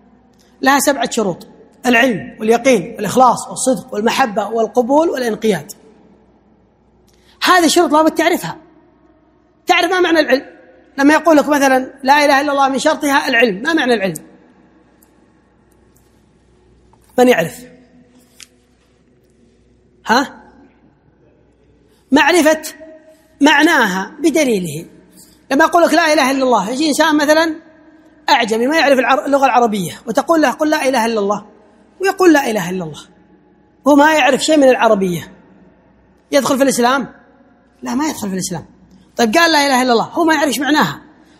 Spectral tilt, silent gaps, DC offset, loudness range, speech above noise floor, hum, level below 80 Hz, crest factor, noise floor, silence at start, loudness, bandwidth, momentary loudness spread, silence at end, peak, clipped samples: -3.5 dB/octave; none; under 0.1%; 7 LU; 40 dB; none; -54 dBFS; 16 dB; -54 dBFS; 0.6 s; -13 LUFS; 16.5 kHz; 11 LU; 0.4 s; 0 dBFS; under 0.1%